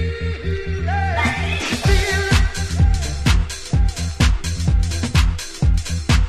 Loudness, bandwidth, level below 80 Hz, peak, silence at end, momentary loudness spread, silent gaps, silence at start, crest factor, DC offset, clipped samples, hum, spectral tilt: -20 LUFS; 14 kHz; -20 dBFS; -2 dBFS; 0 s; 5 LU; none; 0 s; 16 dB; under 0.1%; under 0.1%; none; -5 dB/octave